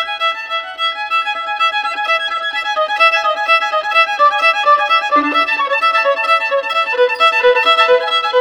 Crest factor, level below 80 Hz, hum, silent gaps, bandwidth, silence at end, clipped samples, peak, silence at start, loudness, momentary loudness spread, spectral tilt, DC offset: 12 dB; -60 dBFS; none; none; 17.5 kHz; 0 s; under 0.1%; -2 dBFS; 0 s; -13 LUFS; 7 LU; -0.5 dB/octave; under 0.1%